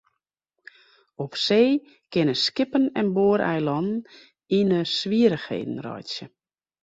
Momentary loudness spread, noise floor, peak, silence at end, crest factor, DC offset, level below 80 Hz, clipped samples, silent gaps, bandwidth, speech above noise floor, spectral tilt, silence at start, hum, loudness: 12 LU; -80 dBFS; -6 dBFS; 0.55 s; 18 dB; under 0.1%; -64 dBFS; under 0.1%; none; 8 kHz; 57 dB; -6 dB/octave; 1.2 s; none; -23 LUFS